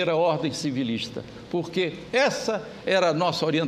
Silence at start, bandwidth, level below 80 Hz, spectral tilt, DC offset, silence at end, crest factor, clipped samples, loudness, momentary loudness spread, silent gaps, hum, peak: 0 s; 14.5 kHz; -60 dBFS; -5 dB/octave; under 0.1%; 0 s; 16 dB; under 0.1%; -25 LUFS; 8 LU; none; none; -10 dBFS